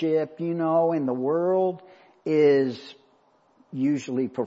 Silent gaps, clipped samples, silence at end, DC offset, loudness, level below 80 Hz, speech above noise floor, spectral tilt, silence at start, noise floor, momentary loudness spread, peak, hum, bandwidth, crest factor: none; under 0.1%; 0 s; under 0.1%; -24 LUFS; -78 dBFS; 39 dB; -7.5 dB/octave; 0 s; -62 dBFS; 14 LU; -10 dBFS; none; 7.8 kHz; 16 dB